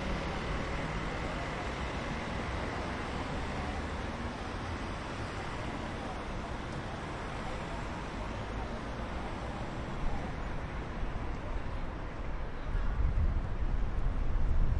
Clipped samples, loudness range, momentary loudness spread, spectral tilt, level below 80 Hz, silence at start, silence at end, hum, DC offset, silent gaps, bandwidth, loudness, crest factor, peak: under 0.1%; 3 LU; 5 LU; -6 dB/octave; -38 dBFS; 0 s; 0 s; none; under 0.1%; none; 10.5 kHz; -38 LUFS; 18 dB; -16 dBFS